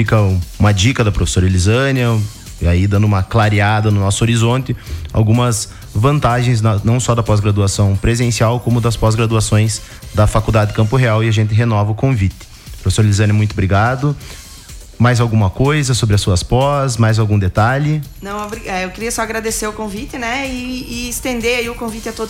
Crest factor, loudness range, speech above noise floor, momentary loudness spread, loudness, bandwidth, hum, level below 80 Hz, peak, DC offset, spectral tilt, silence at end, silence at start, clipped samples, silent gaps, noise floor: 12 dB; 4 LU; 20 dB; 10 LU; -15 LUFS; 15.5 kHz; none; -30 dBFS; -2 dBFS; under 0.1%; -5.5 dB/octave; 0 s; 0 s; under 0.1%; none; -34 dBFS